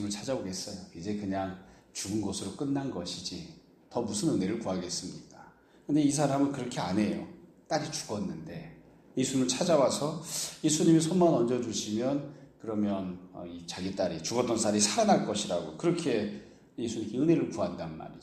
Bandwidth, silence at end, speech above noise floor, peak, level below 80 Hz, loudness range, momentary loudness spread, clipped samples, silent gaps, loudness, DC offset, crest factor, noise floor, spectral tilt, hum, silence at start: 15.5 kHz; 0 s; 26 dB; -10 dBFS; -64 dBFS; 7 LU; 17 LU; under 0.1%; none; -30 LUFS; under 0.1%; 20 dB; -56 dBFS; -4.5 dB/octave; none; 0 s